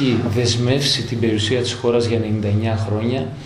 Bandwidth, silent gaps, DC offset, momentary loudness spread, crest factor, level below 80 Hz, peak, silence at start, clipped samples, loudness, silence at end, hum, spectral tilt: 12.5 kHz; none; under 0.1%; 4 LU; 14 dB; -48 dBFS; -4 dBFS; 0 s; under 0.1%; -19 LUFS; 0 s; none; -5.5 dB/octave